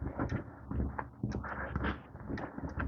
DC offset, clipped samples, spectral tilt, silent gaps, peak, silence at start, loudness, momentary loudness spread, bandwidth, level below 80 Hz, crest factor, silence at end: under 0.1%; under 0.1%; -8 dB/octave; none; -20 dBFS; 0 s; -40 LUFS; 5 LU; 6.6 kHz; -44 dBFS; 18 dB; 0 s